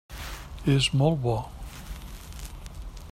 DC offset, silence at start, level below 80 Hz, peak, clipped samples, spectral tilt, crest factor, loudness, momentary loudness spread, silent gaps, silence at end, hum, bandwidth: under 0.1%; 0.1 s; -40 dBFS; -8 dBFS; under 0.1%; -5.5 dB/octave; 20 dB; -25 LUFS; 20 LU; none; 0 s; none; 16 kHz